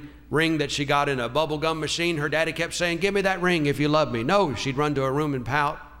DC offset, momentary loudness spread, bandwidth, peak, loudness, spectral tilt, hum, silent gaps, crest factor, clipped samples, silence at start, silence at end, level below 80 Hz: under 0.1%; 3 LU; 16 kHz; -8 dBFS; -24 LUFS; -5 dB/octave; none; none; 16 dB; under 0.1%; 0 s; 0 s; -48 dBFS